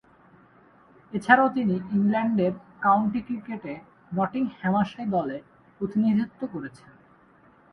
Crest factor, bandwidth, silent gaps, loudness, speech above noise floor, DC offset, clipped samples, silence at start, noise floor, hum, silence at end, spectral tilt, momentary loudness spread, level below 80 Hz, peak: 24 dB; 10.5 kHz; none; -25 LUFS; 32 dB; under 0.1%; under 0.1%; 1.1 s; -57 dBFS; none; 1.05 s; -8 dB/octave; 15 LU; -62 dBFS; -2 dBFS